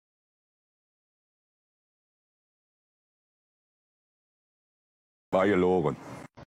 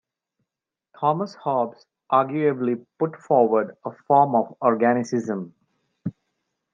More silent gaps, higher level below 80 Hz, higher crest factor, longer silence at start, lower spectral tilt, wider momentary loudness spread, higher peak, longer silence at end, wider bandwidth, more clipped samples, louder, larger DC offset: neither; first, -66 dBFS vs -76 dBFS; about the same, 24 dB vs 20 dB; first, 5.3 s vs 1 s; about the same, -7.5 dB/octave vs -7.5 dB/octave; about the same, 17 LU vs 16 LU; second, -10 dBFS vs -4 dBFS; second, 0 s vs 0.65 s; first, 11.5 kHz vs 7.6 kHz; neither; second, -26 LUFS vs -22 LUFS; neither